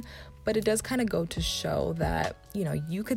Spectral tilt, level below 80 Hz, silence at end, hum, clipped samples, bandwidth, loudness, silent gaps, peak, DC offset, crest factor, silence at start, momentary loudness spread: -5 dB/octave; -44 dBFS; 0 s; none; under 0.1%; 17 kHz; -30 LUFS; none; -14 dBFS; under 0.1%; 16 dB; 0 s; 6 LU